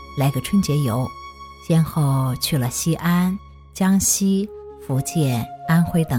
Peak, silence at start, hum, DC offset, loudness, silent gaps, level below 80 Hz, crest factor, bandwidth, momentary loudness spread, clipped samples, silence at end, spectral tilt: -6 dBFS; 0 s; none; under 0.1%; -20 LUFS; none; -44 dBFS; 14 dB; 17.5 kHz; 14 LU; under 0.1%; 0 s; -5.5 dB/octave